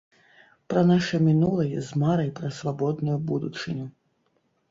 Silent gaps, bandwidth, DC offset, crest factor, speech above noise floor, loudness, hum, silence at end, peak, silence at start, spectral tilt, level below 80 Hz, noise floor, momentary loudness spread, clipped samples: none; 7.8 kHz; under 0.1%; 16 dB; 46 dB; -25 LUFS; none; 0.8 s; -10 dBFS; 0.7 s; -7.5 dB/octave; -60 dBFS; -70 dBFS; 11 LU; under 0.1%